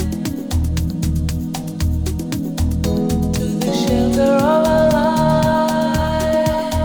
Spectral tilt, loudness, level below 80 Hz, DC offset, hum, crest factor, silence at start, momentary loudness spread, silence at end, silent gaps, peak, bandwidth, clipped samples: -6.5 dB/octave; -18 LUFS; -28 dBFS; under 0.1%; none; 14 dB; 0 s; 8 LU; 0 s; none; -4 dBFS; over 20 kHz; under 0.1%